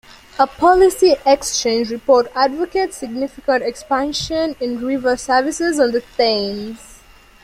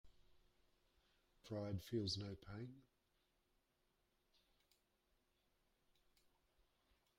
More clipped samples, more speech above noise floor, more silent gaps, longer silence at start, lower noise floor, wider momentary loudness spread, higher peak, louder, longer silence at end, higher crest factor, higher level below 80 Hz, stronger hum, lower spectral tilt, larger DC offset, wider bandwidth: neither; second, 29 dB vs 37 dB; neither; first, 0.35 s vs 0.05 s; second, -45 dBFS vs -84 dBFS; second, 11 LU vs 18 LU; first, -2 dBFS vs -34 dBFS; first, -17 LUFS vs -48 LUFS; second, 0.5 s vs 4.35 s; second, 16 dB vs 22 dB; first, -46 dBFS vs -76 dBFS; neither; second, -3 dB/octave vs -5.5 dB/octave; neither; about the same, 15.5 kHz vs 16 kHz